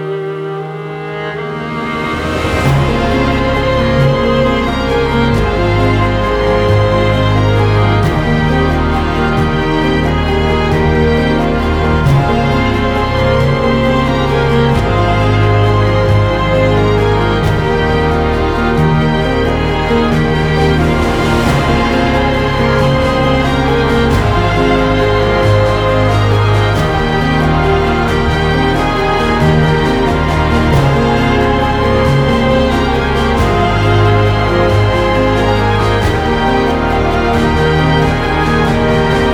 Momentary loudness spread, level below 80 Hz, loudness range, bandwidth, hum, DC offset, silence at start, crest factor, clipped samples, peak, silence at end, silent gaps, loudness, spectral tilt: 2 LU; -22 dBFS; 1 LU; 14 kHz; none; under 0.1%; 0 s; 10 dB; under 0.1%; -2 dBFS; 0 s; none; -12 LUFS; -7 dB/octave